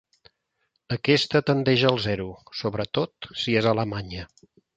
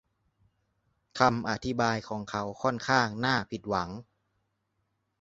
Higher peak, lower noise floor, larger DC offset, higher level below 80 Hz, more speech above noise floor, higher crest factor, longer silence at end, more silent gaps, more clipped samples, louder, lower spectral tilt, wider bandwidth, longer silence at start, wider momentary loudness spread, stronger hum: about the same, -4 dBFS vs -6 dBFS; about the same, -75 dBFS vs -78 dBFS; neither; first, -52 dBFS vs -60 dBFS; about the same, 51 dB vs 49 dB; about the same, 22 dB vs 26 dB; second, 0.5 s vs 1.2 s; neither; neither; first, -24 LUFS vs -29 LUFS; about the same, -6 dB/octave vs -5 dB/octave; first, 9 kHz vs 8 kHz; second, 0.9 s vs 1.15 s; first, 13 LU vs 9 LU; neither